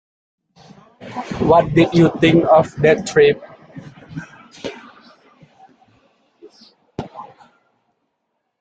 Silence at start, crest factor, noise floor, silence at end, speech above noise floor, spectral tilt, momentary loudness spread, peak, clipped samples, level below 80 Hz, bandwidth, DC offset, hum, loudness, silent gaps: 1 s; 18 dB; -73 dBFS; 1.4 s; 60 dB; -6.5 dB/octave; 24 LU; -2 dBFS; under 0.1%; -50 dBFS; 9 kHz; under 0.1%; none; -14 LUFS; none